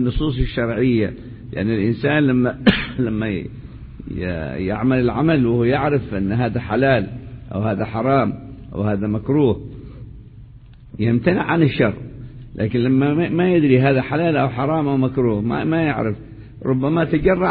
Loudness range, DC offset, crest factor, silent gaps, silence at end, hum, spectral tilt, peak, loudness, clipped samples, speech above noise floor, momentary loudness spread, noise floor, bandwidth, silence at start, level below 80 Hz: 4 LU; under 0.1%; 18 dB; none; 0 s; none; -10.5 dB/octave; 0 dBFS; -19 LUFS; under 0.1%; 24 dB; 17 LU; -42 dBFS; 4.9 kHz; 0 s; -36 dBFS